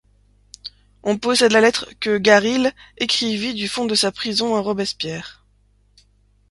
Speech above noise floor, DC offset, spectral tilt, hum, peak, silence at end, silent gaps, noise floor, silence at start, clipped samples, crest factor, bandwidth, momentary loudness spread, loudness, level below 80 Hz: 39 dB; under 0.1%; -3 dB/octave; 50 Hz at -45 dBFS; 0 dBFS; 1.2 s; none; -58 dBFS; 0.65 s; under 0.1%; 20 dB; 11.5 kHz; 18 LU; -19 LUFS; -56 dBFS